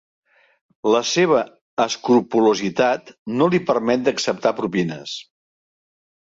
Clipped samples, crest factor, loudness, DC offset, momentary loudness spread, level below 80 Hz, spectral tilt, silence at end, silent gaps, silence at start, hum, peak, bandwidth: under 0.1%; 18 dB; -20 LUFS; under 0.1%; 10 LU; -62 dBFS; -4.5 dB/octave; 1.1 s; 1.61-1.77 s, 3.18-3.26 s; 0.85 s; none; -4 dBFS; 7.8 kHz